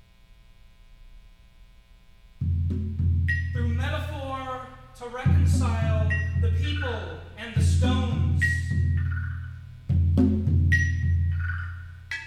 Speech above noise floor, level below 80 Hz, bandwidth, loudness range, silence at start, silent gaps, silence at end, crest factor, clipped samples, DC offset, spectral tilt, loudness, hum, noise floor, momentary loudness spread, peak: 29 dB; -34 dBFS; 10 kHz; 5 LU; 0.65 s; none; 0 s; 16 dB; under 0.1%; under 0.1%; -6.5 dB/octave; -25 LUFS; none; -53 dBFS; 15 LU; -8 dBFS